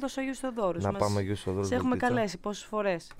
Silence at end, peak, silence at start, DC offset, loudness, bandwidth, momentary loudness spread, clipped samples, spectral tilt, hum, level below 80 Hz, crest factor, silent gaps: 0 s; -12 dBFS; 0 s; under 0.1%; -30 LUFS; 16 kHz; 6 LU; under 0.1%; -6 dB/octave; none; -54 dBFS; 18 dB; none